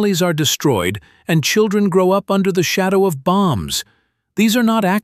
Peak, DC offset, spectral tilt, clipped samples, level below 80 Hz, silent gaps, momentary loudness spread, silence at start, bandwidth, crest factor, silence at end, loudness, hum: -2 dBFS; under 0.1%; -4.5 dB/octave; under 0.1%; -48 dBFS; none; 7 LU; 0 s; 16 kHz; 14 dB; 0.05 s; -16 LUFS; none